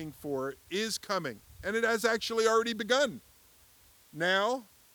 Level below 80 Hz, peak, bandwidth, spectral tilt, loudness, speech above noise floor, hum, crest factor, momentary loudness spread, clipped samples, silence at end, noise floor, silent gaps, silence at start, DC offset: -66 dBFS; -12 dBFS; over 20 kHz; -3 dB/octave; -31 LUFS; 30 dB; none; 20 dB; 11 LU; under 0.1%; 0.3 s; -61 dBFS; none; 0 s; under 0.1%